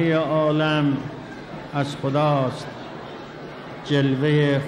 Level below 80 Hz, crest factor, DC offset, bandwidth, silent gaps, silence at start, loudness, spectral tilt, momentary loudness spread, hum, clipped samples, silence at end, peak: -56 dBFS; 14 dB; under 0.1%; 10 kHz; none; 0 s; -22 LUFS; -7.5 dB/octave; 16 LU; none; under 0.1%; 0 s; -8 dBFS